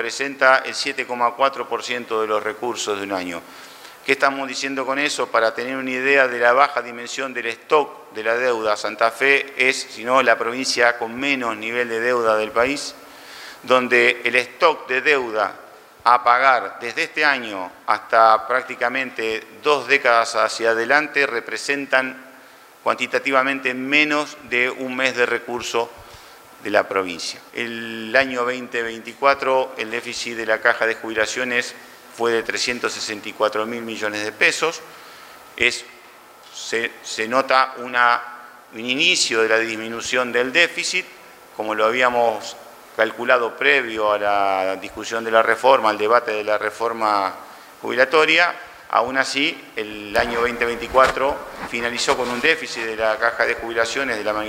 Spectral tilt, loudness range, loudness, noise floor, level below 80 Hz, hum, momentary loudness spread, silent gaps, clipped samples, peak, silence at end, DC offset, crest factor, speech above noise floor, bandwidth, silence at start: -2 dB/octave; 4 LU; -19 LUFS; -46 dBFS; -58 dBFS; none; 12 LU; none; under 0.1%; 0 dBFS; 0 s; under 0.1%; 20 dB; 26 dB; 16 kHz; 0 s